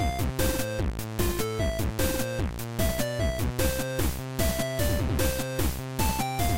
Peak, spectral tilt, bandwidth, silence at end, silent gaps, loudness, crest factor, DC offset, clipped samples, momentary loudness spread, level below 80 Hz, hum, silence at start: -12 dBFS; -4.5 dB/octave; 17 kHz; 0 s; none; -28 LUFS; 14 dB; 0.9%; under 0.1%; 3 LU; -34 dBFS; none; 0 s